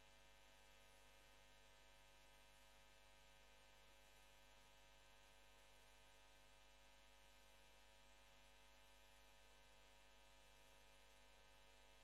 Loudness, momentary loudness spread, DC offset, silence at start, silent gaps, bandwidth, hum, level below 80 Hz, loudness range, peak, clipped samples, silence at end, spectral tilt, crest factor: -70 LUFS; 0 LU; under 0.1%; 0 s; none; 12.5 kHz; 50 Hz at -80 dBFS; -78 dBFS; 0 LU; -54 dBFS; under 0.1%; 0 s; -2 dB/octave; 16 dB